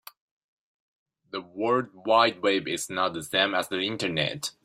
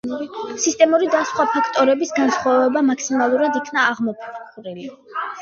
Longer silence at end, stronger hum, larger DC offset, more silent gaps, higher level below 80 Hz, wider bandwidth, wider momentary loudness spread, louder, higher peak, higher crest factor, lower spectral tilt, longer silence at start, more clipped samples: first, 0.15 s vs 0 s; neither; neither; neither; about the same, -68 dBFS vs -66 dBFS; first, 16 kHz vs 7.8 kHz; second, 9 LU vs 17 LU; second, -26 LUFS vs -18 LUFS; second, -6 dBFS vs -2 dBFS; about the same, 22 dB vs 18 dB; about the same, -3.5 dB/octave vs -3 dB/octave; first, 1.35 s vs 0.05 s; neither